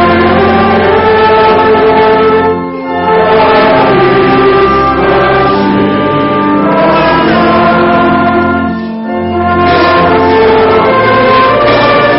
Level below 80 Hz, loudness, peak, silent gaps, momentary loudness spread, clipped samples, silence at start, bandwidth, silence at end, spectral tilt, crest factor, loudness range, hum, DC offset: -32 dBFS; -7 LUFS; 0 dBFS; none; 5 LU; under 0.1%; 0 s; 5.8 kHz; 0 s; -4 dB/octave; 6 dB; 1 LU; none; under 0.1%